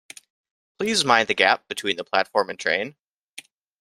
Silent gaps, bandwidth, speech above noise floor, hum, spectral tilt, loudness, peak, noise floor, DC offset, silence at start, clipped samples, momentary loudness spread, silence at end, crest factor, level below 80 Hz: none; 16 kHz; 25 dB; none; -2 dB/octave; -21 LUFS; -2 dBFS; -47 dBFS; under 0.1%; 0.8 s; under 0.1%; 19 LU; 0.9 s; 24 dB; -68 dBFS